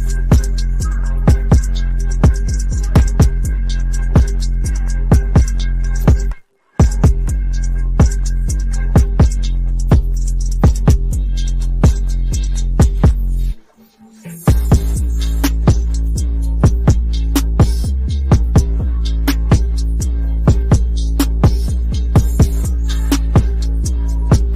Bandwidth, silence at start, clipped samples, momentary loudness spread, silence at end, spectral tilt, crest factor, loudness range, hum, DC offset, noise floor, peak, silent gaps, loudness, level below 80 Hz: 15 kHz; 0 s; under 0.1%; 7 LU; 0 s; -6.5 dB/octave; 10 dB; 1 LU; none; 0.4%; -45 dBFS; -2 dBFS; none; -16 LUFS; -14 dBFS